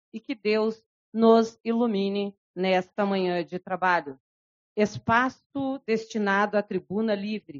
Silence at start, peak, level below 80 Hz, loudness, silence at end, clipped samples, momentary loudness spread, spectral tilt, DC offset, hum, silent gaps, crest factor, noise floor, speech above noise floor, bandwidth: 0.15 s; -6 dBFS; -66 dBFS; -26 LUFS; 0 s; under 0.1%; 10 LU; -4 dB/octave; under 0.1%; none; 0.86-1.12 s, 1.60-1.64 s, 2.38-2.54 s, 4.20-4.76 s, 5.46-5.50 s; 20 dB; under -90 dBFS; over 65 dB; 7.4 kHz